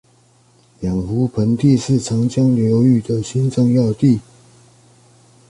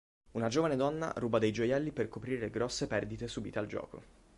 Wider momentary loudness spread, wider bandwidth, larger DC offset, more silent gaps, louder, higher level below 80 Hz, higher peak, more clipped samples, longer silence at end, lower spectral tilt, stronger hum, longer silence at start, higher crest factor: second, 7 LU vs 10 LU; about the same, 11 kHz vs 11.5 kHz; neither; neither; first, -16 LUFS vs -35 LUFS; first, -44 dBFS vs -58 dBFS; first, -2 dBFS vs -16 dBFS; neither; first, 1.3 s vs 0.35 s; first, -8 dB/octave vs -5.5 dB/octave; neither; first, 0.8 s vs 0.35 s; about the same, 14 dB vs 18 dB